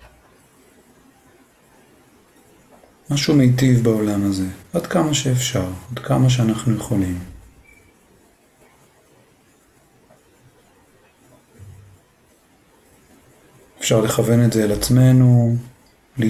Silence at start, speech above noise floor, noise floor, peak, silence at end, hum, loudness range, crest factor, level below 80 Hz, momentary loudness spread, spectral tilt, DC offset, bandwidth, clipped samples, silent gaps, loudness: 3.1 s; 39 dB; -56 dBFS; -4 dBFS; 0 s; none; 10 LU; 18 dB; -44 dBFS; 12 LU; -6 dB/octave; under 0.1%; 15.5 kHz; under 0.1%; none; -18 LUFS